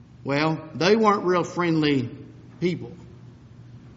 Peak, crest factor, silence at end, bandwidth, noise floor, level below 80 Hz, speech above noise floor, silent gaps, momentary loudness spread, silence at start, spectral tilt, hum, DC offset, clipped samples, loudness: -6 dBFS; 18 dB; 0 s; 7.6 kHz; -46 dBFS; -60 dBFS; 23 dB; none; 15 LU; 0.2 s; -4.5 dB/octave; none; under 0.1%; under 0.1%; -23 LUFS